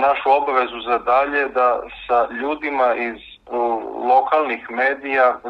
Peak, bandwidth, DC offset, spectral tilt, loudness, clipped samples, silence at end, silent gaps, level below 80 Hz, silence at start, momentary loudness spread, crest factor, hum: -4 dBFS; 5.8 kHz; under 0.1%; -5 dB/octave; -19 LUFS; under 0.1%; 0 s; none; -54 dBFS; 0 s; 7 LU; 16 dB; none